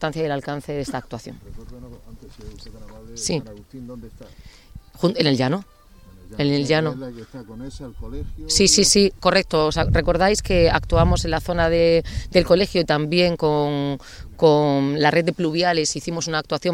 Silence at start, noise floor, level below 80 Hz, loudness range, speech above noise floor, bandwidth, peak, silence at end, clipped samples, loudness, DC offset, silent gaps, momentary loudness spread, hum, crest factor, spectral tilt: 0 s; -46 dBFS; -34 dBFS; 14 LU; 25 dB; 16.5 kHz; -2 dBFS; 0 s; under 0.1%; -19 LUFS; under 0.1%; none; 21 LU; none; 20 dB; -4 dB/octave